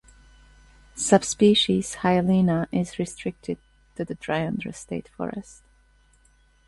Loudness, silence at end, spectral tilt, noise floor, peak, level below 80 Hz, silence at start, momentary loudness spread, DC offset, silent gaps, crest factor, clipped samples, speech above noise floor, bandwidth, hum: -24 LUFS; 1.25 s; -5 dB/octave; -60 dBFS; -4 dBFS; -54 dBFS; 0.95 s; 16 LU; under 0.1%; none; 22 dB; under 0.1%; 36 dB; 11.5 kHz; none